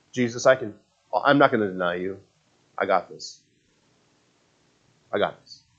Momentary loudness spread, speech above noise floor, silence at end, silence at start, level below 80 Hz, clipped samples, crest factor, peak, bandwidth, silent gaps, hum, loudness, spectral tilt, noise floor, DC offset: 20 LU; 42 dB; 0.25 s; 0.15 s; -72 dBFS; under 0.1%; 24 dB; -2 dBFS; 7.8 kHz; none; none; -23 LUFS; -5 dB/octave; -65 dBFS; under 0.1%